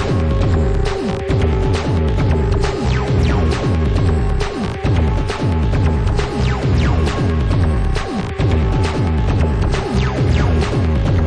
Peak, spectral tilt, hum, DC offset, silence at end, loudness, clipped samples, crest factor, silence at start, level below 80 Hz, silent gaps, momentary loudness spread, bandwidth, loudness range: -4 dBFS; -7 dB/octave; none; under 0.1%; 0 s; -17 LUFS; under 0.1%; 12 dB; 0 s; -20 dBFS; none; 3 LU; 10 kHz; 1 LU